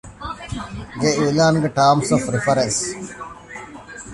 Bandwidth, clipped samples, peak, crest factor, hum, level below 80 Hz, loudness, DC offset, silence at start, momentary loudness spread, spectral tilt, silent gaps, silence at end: 11.5 kHz; under 0.1%; -2 dBFS; 18 dB; none; -44 dBFS; -18 LUFS; under 0.1%; 0.05 s; 19 LU; -4.5 dB/octave; none; 0 s